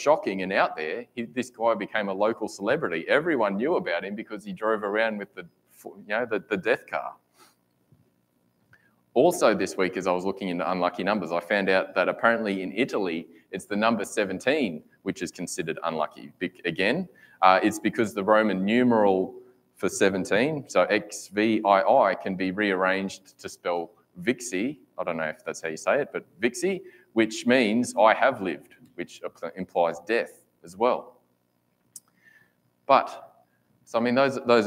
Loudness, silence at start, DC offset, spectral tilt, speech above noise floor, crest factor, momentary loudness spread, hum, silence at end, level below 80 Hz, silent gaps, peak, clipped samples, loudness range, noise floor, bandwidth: -25 LUFS; 0 s; under 0.1%; -4.5 dB/octave; 45 dB; 24 dB; 14 LU; 60 Hz at -60 dBFS; 0 s; -72 dBFS; none; -2 dBFS; under 0.1%; 7 LU; -71 dBFS; 16 kHz